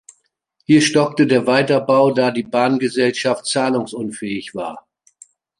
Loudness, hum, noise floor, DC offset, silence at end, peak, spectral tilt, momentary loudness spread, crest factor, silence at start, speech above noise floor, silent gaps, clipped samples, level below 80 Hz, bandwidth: -17 LUFS; none; -67 dBFS; under 0.1%; 0.8 s; -2 dBFS; -5 dB/octave; 12 LU; 16 dB; 0.7 s; 50 dB; none; under 0.1%; -64 dBFS; 11.5 kHz